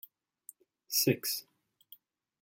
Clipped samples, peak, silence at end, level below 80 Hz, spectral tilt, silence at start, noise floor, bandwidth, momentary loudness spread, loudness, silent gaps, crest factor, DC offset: under 0.1%; -14 dBFS; 1 s; -78 dBFS; -3 dB/octave; 0.9 s; -61 dBFS; 17 kHz; 26 LU; -31 LUFS; none; 24 dB; under 0.1%